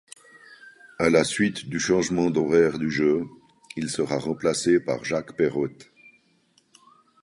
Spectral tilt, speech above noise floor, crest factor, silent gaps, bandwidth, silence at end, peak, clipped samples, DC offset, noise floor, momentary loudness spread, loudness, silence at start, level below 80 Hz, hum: -5 dB/octave; 41 dB; 20 dB; none; 11.5 kHz; 1.4 s; -6 dBFS; under 0.1%; under 0.1%; -64 dBFS; 9 LU; -24 LUFS; 0.5 s; -58 dBFS; none